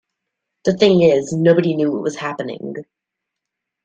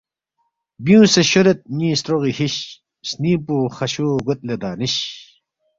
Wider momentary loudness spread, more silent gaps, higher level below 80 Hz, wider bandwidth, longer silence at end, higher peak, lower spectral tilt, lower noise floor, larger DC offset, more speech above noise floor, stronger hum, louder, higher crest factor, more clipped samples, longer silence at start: about the same, 16 LU vs 15 LU; neither; about the same, -58 dBFS vs -54 dBFS; first, 9 kHz vs 7.8 kHz; first, 1 s vs 0.55 s; about the same, 0 dBFS vs -2 dBFS; first, -6.5 dB/octave vs -5 dB/octave; first, -81 dBFS vs -71 dBFS; neither; first, 65 dB vs 54 dB; neither; about the same, -17 LUFS vs -18 LUFS; about the same, 18 dB vs 18 dB; neither; second, 0.65 s vs 0.8 s